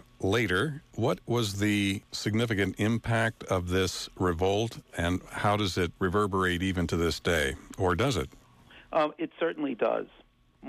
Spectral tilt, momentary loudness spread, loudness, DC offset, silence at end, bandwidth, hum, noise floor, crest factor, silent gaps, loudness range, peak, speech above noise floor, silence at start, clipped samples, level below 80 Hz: -5.5 dB/octave; 5 LU; -29 LUFS; under 0.1%; 0 s; 15.5 kHz; none; -55 dBFS; 14 dB; none; 2 LU; -16 dBFS; 26 dB; 0.2 s; under 0.1%; -50 dBFS